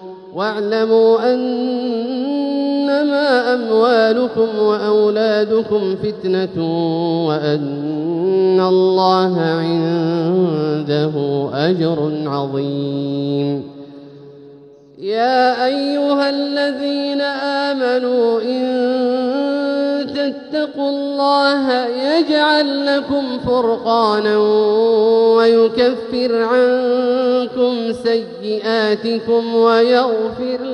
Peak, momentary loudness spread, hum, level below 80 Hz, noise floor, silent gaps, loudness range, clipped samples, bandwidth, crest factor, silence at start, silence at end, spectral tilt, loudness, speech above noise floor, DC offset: -2 dBFS; 7 LU; none; -58 dBFS; -42 dBFS; none; 5 LU; under 0.1%; 9.8 kHz; 14 dB; 0 s; 0 s; -7 dB/octave; -16 LUFS; 26 dB; under 0.1%